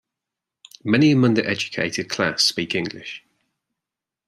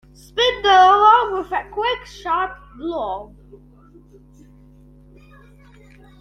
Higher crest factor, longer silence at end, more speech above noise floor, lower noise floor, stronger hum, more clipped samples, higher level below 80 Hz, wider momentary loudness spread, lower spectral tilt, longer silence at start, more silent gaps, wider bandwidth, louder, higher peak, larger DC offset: about the same, 20 dB vs 18 dB; second, 1.1 s vs 2.95 s; first, 66 dB vs 30 dB; first, -87 dBFS vs -47 dBFS; neither; neither; second, -64 dBFS vs -48 dBFS; about the same, 17 LU vs 17 LU; first, -4.5 dB/octave vs -3 dB/octave; first, 0.85 s vs 0.35 s; neither; first, 14 kHz vs 9.4 kHz; second, -20 LUFS vs -17 LUFS; about the same, -2 dBFS vs -2 dBFS; neither